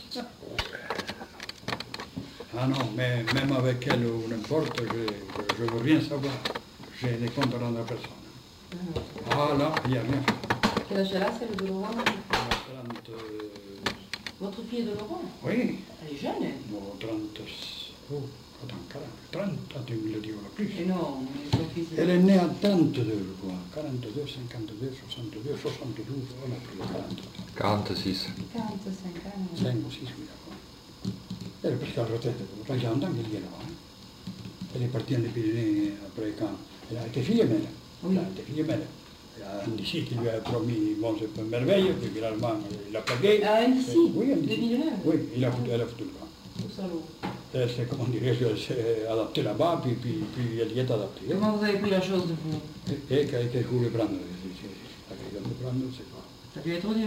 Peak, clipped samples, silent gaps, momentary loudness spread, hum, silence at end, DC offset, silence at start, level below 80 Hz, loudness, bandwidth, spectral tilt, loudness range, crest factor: -10 dBFS; under 0.1%; none; 15 LU; none; 0 s; under 0.1%; 0 s; -56 dBFS; -30 LUFS; 16 kHz; -6.5 dB/octave; 8 LU; 20 dB